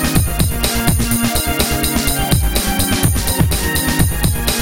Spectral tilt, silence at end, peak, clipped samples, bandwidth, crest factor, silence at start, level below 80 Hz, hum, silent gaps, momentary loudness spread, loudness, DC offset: -4 dB/octave; 0 s; 0 dBFS; under 0.1%; 17.5 kHz; 14 dB; 0 s; -22 dBFS; none; none; 1 LU; -15 LUFS; 3%